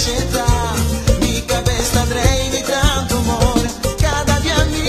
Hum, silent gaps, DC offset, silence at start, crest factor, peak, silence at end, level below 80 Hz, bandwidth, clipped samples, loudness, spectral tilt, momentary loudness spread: none; none; 0.4%; 0 s; 16 dB; 0 dBFS; 0 s; -22 dBFS; 14 kHz; under 0.1%; -17 LUFS; -4 dB/octave; 2 LU